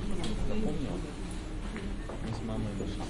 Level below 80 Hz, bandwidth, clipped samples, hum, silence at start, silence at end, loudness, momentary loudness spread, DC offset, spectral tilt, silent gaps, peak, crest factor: -38 dBFS; 11.5 kHz; under 0.1%; none; 0 s; 0 s; -37 LUFS; 6 LU; under 0.1%; -6 dB/octave; none; -20 dBFS; 12 dB